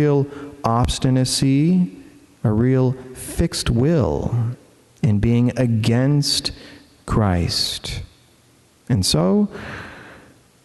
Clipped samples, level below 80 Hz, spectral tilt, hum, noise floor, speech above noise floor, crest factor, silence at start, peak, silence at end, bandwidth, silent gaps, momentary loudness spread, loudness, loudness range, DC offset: under 0.1%; -36 dBFS; -5.5 dB/octave; none; -54 dBFS; 36 dB; 16 dB; 0 s; -4 dBFS; 0.5 s; 12.5 kHz; none; 13 LU; -19 LUFS; 3 LU; under 0.1%